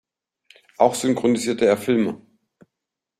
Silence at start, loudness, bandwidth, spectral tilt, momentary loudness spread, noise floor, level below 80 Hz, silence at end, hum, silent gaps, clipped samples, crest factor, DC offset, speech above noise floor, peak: 0.8 s; -20 LUFS; 15 kHz; -5 dB/octave; 5 LU; -84 dBFS; -64 dBFS; 1.05 s; none; none; under 0.1%; 20 dB; under 0.1%; 65 dB; -2 dBFS